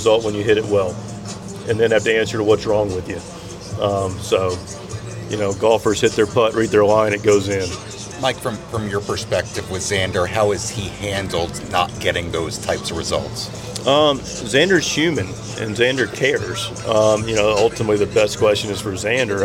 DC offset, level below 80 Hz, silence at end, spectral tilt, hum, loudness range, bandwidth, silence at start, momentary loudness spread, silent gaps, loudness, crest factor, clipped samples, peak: under 0.1%; -44 dBFS; 0 s; -4 dB/octave; none; 4 LU; 16.5 kHz; 0 s; 12 LU; none; -19 LUFS; 16 dB; under 0.1%; -2 dBFS